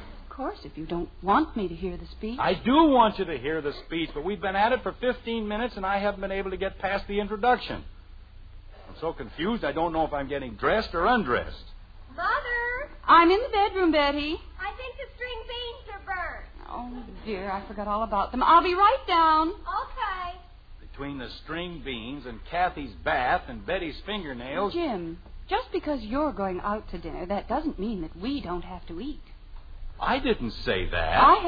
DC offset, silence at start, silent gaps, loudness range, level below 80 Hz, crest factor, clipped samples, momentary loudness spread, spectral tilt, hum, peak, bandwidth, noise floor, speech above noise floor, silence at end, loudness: under 0.1%; 0 s; none; 9 LU; -42 dBFS; 22 dB; under 0.1%; 17 LU; -7.5 dB/octave; none; -6 dBFS; 5 kHz; -46 dBFS; 20 dB; 0 s; -27 LUFS